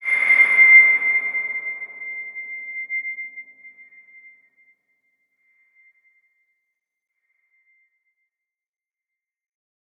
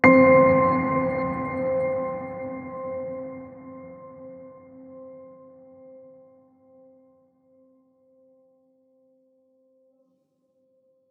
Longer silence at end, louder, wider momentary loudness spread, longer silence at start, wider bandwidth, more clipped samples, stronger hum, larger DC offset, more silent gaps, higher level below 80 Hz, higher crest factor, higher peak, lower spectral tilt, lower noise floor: first, 6.3 s vs 5.8 s; first, -14 LUFS vs -22 LUFS; second, 22 LU vs 29 LU; about the same, 0 s vs 0.05 s; first, 11 kHz vs 4.6 kHz; neither; neither; neither; neither; second, under -90 dBFS vs -62 dBFS; about the same, 20 dB vs 24 dB; about the same, -2 dBFS vs -2 dBFS; second, -1 dB/octave vs -9.5 dB/octave; first, -88 dBFS vs -69 dBFS